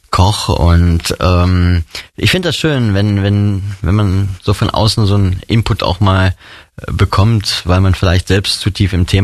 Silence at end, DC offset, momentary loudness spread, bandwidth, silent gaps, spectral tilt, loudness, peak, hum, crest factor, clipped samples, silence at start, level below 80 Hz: 0 s; under 0.1%; 5 LU; 13 kHz; none; -6 dB/octave; -13 LUFS; 0 dBFS; none; 12 dB; under 0.1%; 0.1 s; -24 dBFS